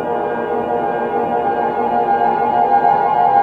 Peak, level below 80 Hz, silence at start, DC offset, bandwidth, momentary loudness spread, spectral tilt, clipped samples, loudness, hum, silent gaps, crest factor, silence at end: -2 dBFS; -54 dBFS; 0 s; under 0.1%; 4.6 kHz; 6 LU; -7.5 dB/octave; under 0.1%; -16 LUFS; none; none; 14 dB; 0 s